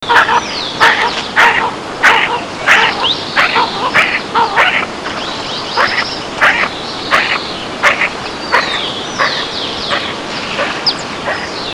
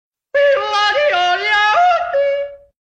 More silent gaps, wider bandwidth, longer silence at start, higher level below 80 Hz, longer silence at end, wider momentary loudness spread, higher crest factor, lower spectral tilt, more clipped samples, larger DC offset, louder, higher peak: neither; first, over 20 kHz vs 8.8 kHz; second, 0 s vs 0.35 s; first, -44 dBFS vs -56 dBFS; second, 0 s vs 0.25 s; about the same, 10 LU vs 8 LU; about the same, 14 dB vs 12 dB; about the same, -2 dB/octave vs -1 dB/octave; first, 0.5% vs under 0.1%; first, 0.1% vs under 0.1%; about the same, -12 LUFS vs -14 LUFS; first, 0 dBFS vs -4 dBFS